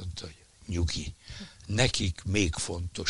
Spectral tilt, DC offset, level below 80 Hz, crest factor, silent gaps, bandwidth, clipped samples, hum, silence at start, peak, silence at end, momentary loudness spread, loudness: -4 dB/octave; under 0.1%; -42 dBFS; 22 dB; none; 11.5 kHz; under 0.1%; none; 0 s; -8 dBFS; 0 s; 18 LU; -30 LUFS